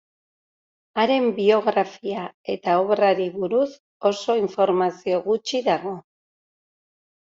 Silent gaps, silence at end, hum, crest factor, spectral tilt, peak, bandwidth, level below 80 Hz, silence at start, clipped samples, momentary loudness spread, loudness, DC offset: 2.34-2.44 s, 3.80-4.00 s; 1.2 s; none; 18 dB; -5 dB/octave; -6 dBFS; 7.8 kHz; -68 dBFS; 0.95 s; under 0.1%; 11 LU; -22 LUFS; under 0.1%